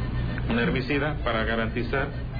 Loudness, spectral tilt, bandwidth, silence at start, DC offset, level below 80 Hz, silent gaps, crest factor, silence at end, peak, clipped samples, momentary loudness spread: -26 LUFS; -9 dB/octave; 5 kHz; 0 s; under 0.1%; -34 dBFS; none; 12 dB; 0 s; -14 dBFS; under 0.1%; 4 LU